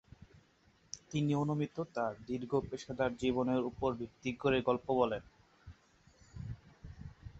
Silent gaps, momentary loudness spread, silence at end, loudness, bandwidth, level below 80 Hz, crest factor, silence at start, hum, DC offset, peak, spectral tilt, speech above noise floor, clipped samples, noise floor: none; 18 LU; 0 s; -35 LUFS; 8 kHz; -60 dBFS; 20 dB; 0.2 s; none; under 0.1%; -16 dBFS; -6 dB/octave; 34 dB; under 0.1%; -69 dBFS